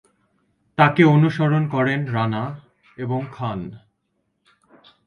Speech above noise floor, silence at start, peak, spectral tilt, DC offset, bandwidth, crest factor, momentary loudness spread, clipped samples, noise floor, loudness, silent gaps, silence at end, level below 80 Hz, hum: 53 dB; 0.8 s; -2 dBFS; -8.5 dB/octave; under 0.1%; 6.6 kHz; 20 dB; 18 LU; under 0.1%; -72 dBFS; -20 LUFS; none; 1.3 s; -58 dBFS; none